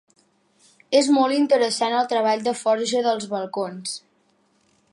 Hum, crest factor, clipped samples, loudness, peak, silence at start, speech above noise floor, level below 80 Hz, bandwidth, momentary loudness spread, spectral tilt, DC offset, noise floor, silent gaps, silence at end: none; 18 dB; under 0.1%; -21 LUFS; -4 dBFS; 0.9 s; 43 dB; -78 dBFS; 11.5 kHz; 10 LU; -3.5 dB/octave; under 0.1%; -64 dBFS; none; 0.95 s